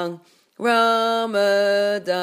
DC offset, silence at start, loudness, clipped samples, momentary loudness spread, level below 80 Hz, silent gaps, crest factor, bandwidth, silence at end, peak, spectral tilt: under 0.1%; 0 s; -19 LUFS; under 0.1%; 6 LU; -84 dBFS; none; 14 dB; 15.5 kHz; 0 s; -6 dBFS; -4 dB/octave